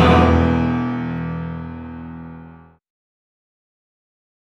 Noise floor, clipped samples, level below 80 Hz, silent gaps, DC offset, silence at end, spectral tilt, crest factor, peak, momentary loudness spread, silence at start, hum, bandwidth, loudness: -43 dBFS; under 0.1%; -32 dBFS; none; under 0.1%; 1.95 s; -8 dB/octave; 20 dB; -2 dBFS; 21 LU; 0 s; none; 7.8 kHz; -19 LUFS